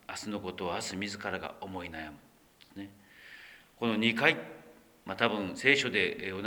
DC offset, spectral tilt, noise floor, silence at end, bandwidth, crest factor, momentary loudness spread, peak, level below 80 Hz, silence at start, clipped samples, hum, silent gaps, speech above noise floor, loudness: under 0.1%; -4 dB/octave; -53 dBFS; 0 s; over 20 kHz; 26 dB; 24 LU; -8 dBFS; -66 dBFS; 0.1 s; under 0.1%; none; none; 21 dB; -31 LUFS